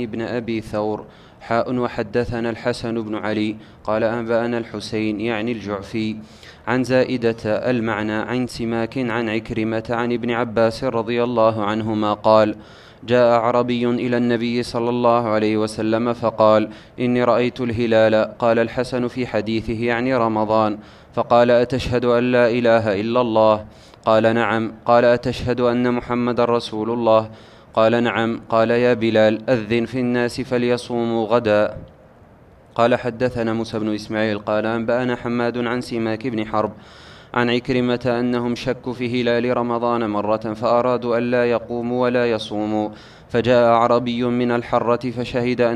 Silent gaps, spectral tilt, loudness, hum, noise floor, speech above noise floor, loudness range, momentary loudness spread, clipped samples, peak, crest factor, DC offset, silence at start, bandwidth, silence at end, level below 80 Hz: none; -6.5 dB/octave; -20 LUFS; none; -48 dBFS; 28 dB; 5 LU; 8 LU; under 0.1%; 0 dBFS; 20 dB; under 0.1%; 0 s; 11.5 kHz; 0 s; -48 dBFS